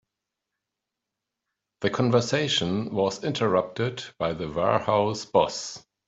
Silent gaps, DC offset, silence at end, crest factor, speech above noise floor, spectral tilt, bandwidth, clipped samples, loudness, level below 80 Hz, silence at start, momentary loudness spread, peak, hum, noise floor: none; under 0.1%; 0.3 s; 20 dB; 61 dB; -5 dB/octave; 8.2 kHz; under 0.1%; -25 LUFS; -60 dBFS; 1.8 s; 8 LU; -6 dBFS; none; -86 dBFS